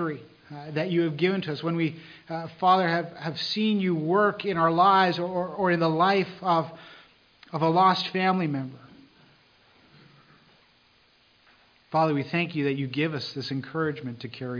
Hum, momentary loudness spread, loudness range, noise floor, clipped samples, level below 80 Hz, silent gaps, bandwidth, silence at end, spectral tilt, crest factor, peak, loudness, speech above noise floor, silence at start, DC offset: none; 15 LU; 9 LU; -62 dBFS; under 0.1%; -70 dBFS; none; 5.2 kHz; 0 s; -7 dB/octave; 18 dB; -8 dBFS; -25 LUFS; 36 dB; 0 s; under 0.1%